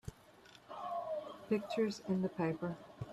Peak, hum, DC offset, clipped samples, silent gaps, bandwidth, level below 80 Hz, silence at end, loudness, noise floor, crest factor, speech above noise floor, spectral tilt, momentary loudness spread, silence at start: -22 dBFS; none; under 0.1%; under 0.1%; none; 13 kHz; -66 dBFS; 0 s; -39 LUFS; -61 dBFS; 16 dB; 24 dB; -7 dB/octave; 17 LU; 0.05 s